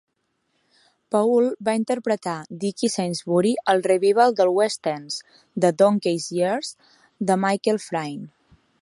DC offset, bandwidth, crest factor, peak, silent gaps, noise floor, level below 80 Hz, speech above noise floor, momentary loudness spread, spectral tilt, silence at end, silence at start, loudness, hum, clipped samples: under 0.1%; 11.5 kHz; 18 dB; -4 dBFS; none; -72 dBFS; -72 dBFS; 51 dB; 12 LU; -5 dB/octave; 0.55 s; 1.1 s; -22 LUFS; none; under 0.1%